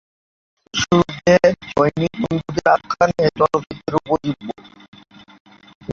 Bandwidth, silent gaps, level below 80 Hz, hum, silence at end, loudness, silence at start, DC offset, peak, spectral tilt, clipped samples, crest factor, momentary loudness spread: 7.6 kHz; 4.88-4.93 s, 5.40-5.45 s, 5.75-5.81 s; -46 dBFS; none; 0 s; -18 LUFS; 0.75 s; under 0.1%; -2 dBFS; -5.5 dB/octave; under 0.1%; 18 dB; 11 LU